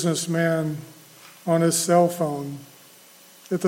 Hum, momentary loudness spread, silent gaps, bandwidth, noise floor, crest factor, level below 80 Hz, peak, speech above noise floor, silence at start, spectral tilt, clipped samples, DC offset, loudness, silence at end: none; 17 LU; none; 17 kHz; -50 dBFS; 18 dB; -70 dBFS; -6 dBFS; 28 dB; 0 s; -5 dB/octave; under 0.1%; under 0.1%; -22 LUFS; 0 s